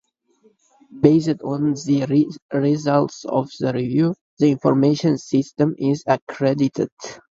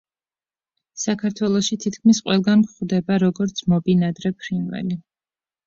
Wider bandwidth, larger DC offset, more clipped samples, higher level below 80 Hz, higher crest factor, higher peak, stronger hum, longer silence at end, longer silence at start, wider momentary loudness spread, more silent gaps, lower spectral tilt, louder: about the same, 7.8 kHz vs 7.6 kHz; neither; neither; about the same, -60 dBFS vs -58 dBFS; about the same, 20 dB vs 16 dB; first, 0 dBFS vs -6 dBFS; neither; second, 0.2 s vs 0.65 s; about the same, 0.95 s vs 0.95 s; second, 6 LU vs 10 LU; first, 2.42-2.49 s, 4.21-4.37 s, 6.22-6.27 s, 6.92-6.97 s vs none; first, -7.5 dB/octave vs -5.5 dB/octave; about the same, -20 LUFS vs -21 LUFS